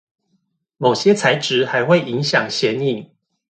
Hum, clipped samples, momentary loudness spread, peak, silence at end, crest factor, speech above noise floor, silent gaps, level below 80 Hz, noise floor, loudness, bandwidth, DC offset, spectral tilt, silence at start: none; under 0.1%; 6 LU; 0 dBFS; 0.55 s; 18 dB; 51 dB; none; -64 dBFS; -68 dBFS; -17 LUFS; 9.2 kHz; under 0.1%; -4.5 dB/octave; 0.8 s